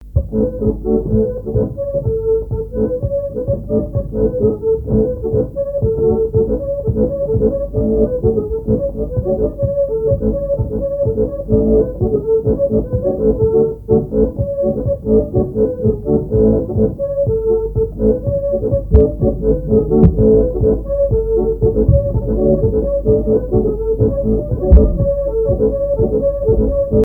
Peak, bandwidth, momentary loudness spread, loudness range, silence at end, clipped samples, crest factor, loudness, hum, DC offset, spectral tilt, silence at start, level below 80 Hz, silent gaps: 0 dBFS; 1.8 kHz; 6 LU; 4 LU; 0 s; under 0.1%; 14 dB; -16 LUFS; none; under 0.1%; -13.5 dB/octave; 0 s; -22 dBFS; none